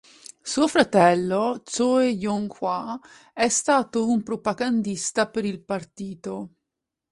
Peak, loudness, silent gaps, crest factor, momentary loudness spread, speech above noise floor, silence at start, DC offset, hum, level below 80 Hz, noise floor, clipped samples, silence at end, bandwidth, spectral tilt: -4 dBFS; -23 LUFS; none; 20 dB; 16 LU; 61 dB; 0.45 s; under 0.1%; none; -62 dBFS; -84 dBFS; under 0.1%; 0.65 s; 11.5 kHz; -4 dB/octave